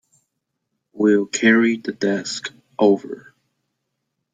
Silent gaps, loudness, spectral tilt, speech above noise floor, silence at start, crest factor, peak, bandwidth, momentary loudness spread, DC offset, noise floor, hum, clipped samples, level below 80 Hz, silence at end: none; -19 LUFS; -4.5 dB/octave; 59 dB; 0.95 s; 18 dB; -2 dBFS; 9.4 kHz; 16 LU; under 0.1%; -77 dBFS; none; under 0.1%; -68 dBFS; 1.15 s